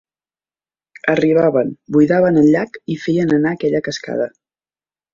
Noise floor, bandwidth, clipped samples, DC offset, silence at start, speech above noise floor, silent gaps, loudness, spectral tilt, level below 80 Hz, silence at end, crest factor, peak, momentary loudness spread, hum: under -90 dBFS; 7.4 kHz; under 0.1%; under 0.1%; 1.05 s; over 75 dB; none; -16 LUFS; -7 dB/octave; -56 dBFS; 0.85 s; 16 dB; -2 dBFS; 10 LU; none